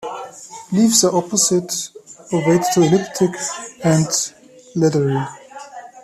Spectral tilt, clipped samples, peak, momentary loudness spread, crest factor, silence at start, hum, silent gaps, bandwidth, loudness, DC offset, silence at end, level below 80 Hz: -4.5 dB/octave; under 0.1%; 0 dBFS; 19 LU; 18 dB; 0 s; none; none; 15 kHz; -17 LUFS; under 0.1%; 0.05 s; -58 dBFS